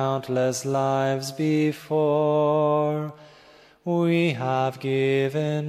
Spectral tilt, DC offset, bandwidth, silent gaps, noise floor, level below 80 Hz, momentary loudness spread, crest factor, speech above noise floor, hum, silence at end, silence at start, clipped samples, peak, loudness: -6.5 dB/octave; under 0.1%; 14 kHz; none; -52 dBFS; -70 dBFS; 5 LU; 14 dB; 30 dB; none; 0 s; 0 s; under 0.1%; -10 dBFS; -23 LUFS